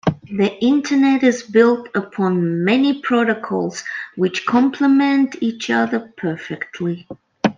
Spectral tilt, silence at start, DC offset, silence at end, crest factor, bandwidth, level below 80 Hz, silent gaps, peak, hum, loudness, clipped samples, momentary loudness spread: -6 dB/octave; 0.05 s; under 0.1%; 0.05 s; 16 dB; 7.6 kHz; -58 dBFS; none; -2 dBFS; none; -18 LUFS; under 0.1%; 11 LU